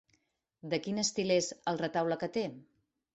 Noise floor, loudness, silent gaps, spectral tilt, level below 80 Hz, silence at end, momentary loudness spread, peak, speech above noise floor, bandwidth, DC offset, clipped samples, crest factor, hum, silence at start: -76 dBFS; -33 LUFS; none; -4 dB/octave; -72 dBFS; 0.55 s; 7 LU; -16 dBFS; 43 dB; 8.4 kHz; under 0.1%; under 0.1%; 18 dB; none; 0.65 s